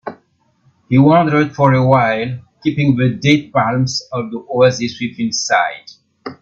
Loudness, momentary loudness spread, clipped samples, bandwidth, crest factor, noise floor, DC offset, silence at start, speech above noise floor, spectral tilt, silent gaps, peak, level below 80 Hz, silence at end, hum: -15 LUFS; 13 LU; under 0.1%; 7.6 kHz; 16 dB; -58 dBFS; under 0.1%; 0.05 s; 44 dB; -6 dB/octave; none; 0 dBFS; -52 dBFS; 0.1 s; none